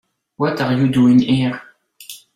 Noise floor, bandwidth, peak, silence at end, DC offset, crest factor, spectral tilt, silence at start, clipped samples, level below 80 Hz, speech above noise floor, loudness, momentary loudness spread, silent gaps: -40 dBFS; 14.5 kHz; -4 dBFS; 0.2 s; under 0.1%; 14 dB; -7 dB/octave; 0.4 s; under 0.1%; -52 dBFS; 25 dB; -16 LUFS; 21 LU; none